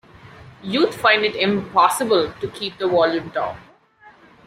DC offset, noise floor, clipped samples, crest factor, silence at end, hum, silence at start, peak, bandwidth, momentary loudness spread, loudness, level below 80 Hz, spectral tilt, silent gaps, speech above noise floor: under 0.1%; -50 dBFS; under 0.1%; 18 dB; 0.4 s; none; 0.25 s; -2 dBFS; 16 kHz; 11 LU; -19 LUFS; -58 dBFS; -4 dB/octave; none; 31 dB